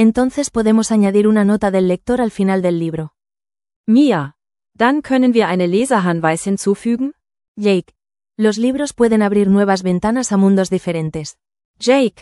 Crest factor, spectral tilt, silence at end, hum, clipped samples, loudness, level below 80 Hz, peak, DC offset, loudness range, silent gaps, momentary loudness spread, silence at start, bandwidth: 14 dB; -6 dB/octave; 0.1 s; none; under 0.1%; -16 LUFS; -48 dBFS; 0 dBFS; under 0.1%; 2 LU; 3.76-3.84 s, 7.48-7.55 s, 11.65-11.74 s; 8 LU; 0 s; 12 kHz